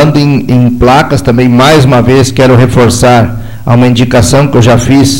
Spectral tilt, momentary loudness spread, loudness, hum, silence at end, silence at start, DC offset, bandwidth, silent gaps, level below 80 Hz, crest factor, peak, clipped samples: -6 dB/octave; 4 LU; -5 LUFS; none; 0 s; 0 s; under 0.1%; 16.5 kHz; none; -24 dBFS; 4 dB; 0 dBFS; 2%